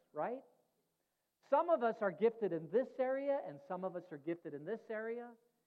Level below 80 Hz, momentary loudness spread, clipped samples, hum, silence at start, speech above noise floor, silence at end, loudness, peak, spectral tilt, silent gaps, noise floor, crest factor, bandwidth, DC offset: under -90 dBFS; 11 LU; under 0.1%; none; 0.15 s; 47 dB; 0.35 s; -39 LUFS; -20 dBFS; -8.5 dB/octave; none; -86 dBFS; 20 dB; 5.8 kHz; under 0.1%